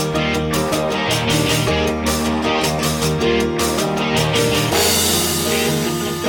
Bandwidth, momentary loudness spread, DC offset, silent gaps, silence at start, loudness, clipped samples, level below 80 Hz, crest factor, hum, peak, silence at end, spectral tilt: 17 kHz; 4 LU; under 0.1%; none; 0 s; -17 LUFS; under 0.1%; -36 dBFS; 14 dB; none; -4 dBFS; 0 s; -3.5 dB/octave